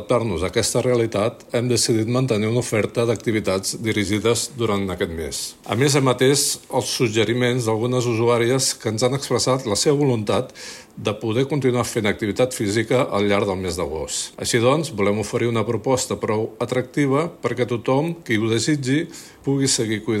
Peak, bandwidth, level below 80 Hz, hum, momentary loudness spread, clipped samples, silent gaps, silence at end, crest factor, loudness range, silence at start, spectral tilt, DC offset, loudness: -4 dBFS; 16 kHz; -50 dBFS; none; 7 LU; under 0.1%; none; 0 s; 16 dB; 2 LU; 0 s; -4.5 dB/octave; under 0.1%; -21 LUFS